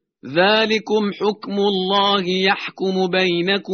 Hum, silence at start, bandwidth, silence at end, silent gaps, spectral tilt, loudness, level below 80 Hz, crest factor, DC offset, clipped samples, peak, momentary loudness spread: none; 0.25 s; 6.6 kHz; 0 s; none; -2.5 dB/octave; -18 LUFS; -62 dBFS; 16 dB; under 0.1%; under 0.1%; -2 dBFS; 6 LU